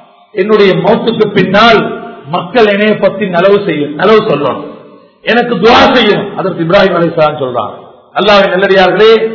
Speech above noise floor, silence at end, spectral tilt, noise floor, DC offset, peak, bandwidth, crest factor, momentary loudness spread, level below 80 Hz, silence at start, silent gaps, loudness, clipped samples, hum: 28 dB; 0 s; -6.5 dB/octave; -35 dBFS; under 0.1%; 0 dBFS; 6 kHz; 8 dB; 12 LU; -42 dBFS; 0.35 s; none; -8 LUFS; 3%; none